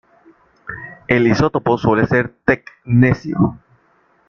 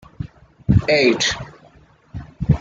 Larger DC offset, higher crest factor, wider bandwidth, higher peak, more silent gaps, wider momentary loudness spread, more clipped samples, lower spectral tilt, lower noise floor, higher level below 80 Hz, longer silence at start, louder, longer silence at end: neither; about the same, 16 dB vs 18 dB; second, 6.8 kHz vs 9.2 kHz; about the same, -2 dBFS vs -2 dBFS; neither; second, 17 LU vs 22 LU; neither; first, -8 dB/octave vs -5 dB/octave; first, -57 dBFS vs -50 dBFS; second, -44 dBFS vs -36 dBFS; first, 0.65 s vs 0.2 s; about the same, -16 LUFS vs -18 LUFS; first, 0.75 s vs 0 s